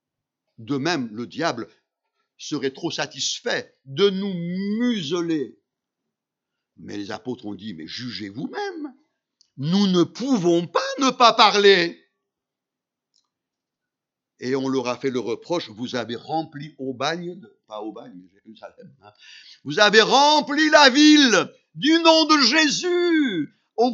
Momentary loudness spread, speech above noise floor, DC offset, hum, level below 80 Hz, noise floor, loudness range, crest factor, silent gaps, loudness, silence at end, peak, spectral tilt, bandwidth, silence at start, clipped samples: 20 LU; 65 dB; under 0.1%; none; -76 dBFS; -86 dBFS; 16 LU; 22 dB; none; -19 LUFS; 0 s; 0 dBFS; -3.5 dB/octave; 7.8 kHz; 0.6 s; under 0.1%